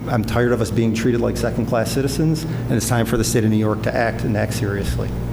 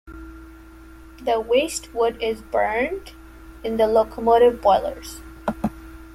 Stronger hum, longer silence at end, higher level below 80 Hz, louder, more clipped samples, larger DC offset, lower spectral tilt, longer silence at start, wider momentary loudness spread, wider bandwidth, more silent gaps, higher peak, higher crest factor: neither; about the same, 0 s vs 0 s; first, -32 dBFS vs -44 dBFS; about the same, -20 LUFS vs -21 LUFS; neither; neither; first, -6 dB/octave vs -4 dB/octave; about the same, 0 s vs 0.05 s; second, 4 LU vs 20 LU; first, over 20 kHz vs 15.5 kHz; neither; about the same, -4 dBFS vs -4 dBFS; about the same, 14 dB vs 18 dB